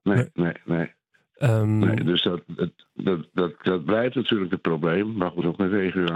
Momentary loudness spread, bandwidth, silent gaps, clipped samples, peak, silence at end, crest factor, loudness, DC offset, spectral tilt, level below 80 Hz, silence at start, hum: 7 LU; 11.5 kHz; none; under 0.1%; -6 dBFS; 0 s; 18 dB; -24 LUFS; under 0.1%; -7.5 dB/octave; -62 dBFS; 0.05 s; none